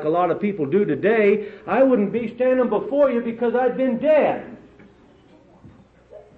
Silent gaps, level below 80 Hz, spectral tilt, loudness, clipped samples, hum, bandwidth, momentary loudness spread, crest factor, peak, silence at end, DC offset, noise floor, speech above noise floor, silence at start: none; -60 dBFS; -9.5 dB/octave; -20 LUFS; under 0.1%; none; 4.6 kHz; 6 LU; 14 dB; -8 dBFS; 0.2 s; under 0.1%; -51 dBFS; 32 dB; 0 s